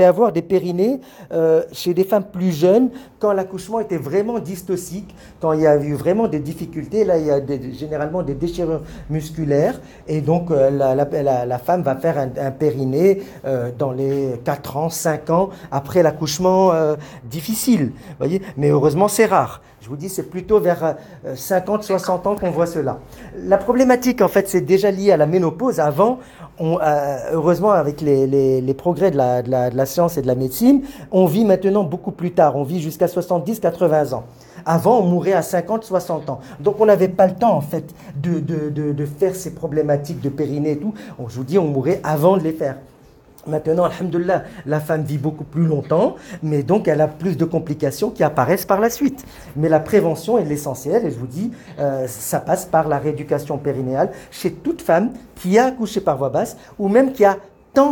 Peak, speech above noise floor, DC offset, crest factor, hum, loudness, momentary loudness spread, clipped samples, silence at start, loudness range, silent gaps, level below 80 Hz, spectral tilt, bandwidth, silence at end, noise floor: -2 dBFS; 29 dB; under 0.1%; 16 dB; none; -19 LUFS; 11 LU; under 0.1%; 0 s; 4 LU; none; -48 dBFS; -6.5 dB/octave; 19 kHz; 0 s; -47 dBFS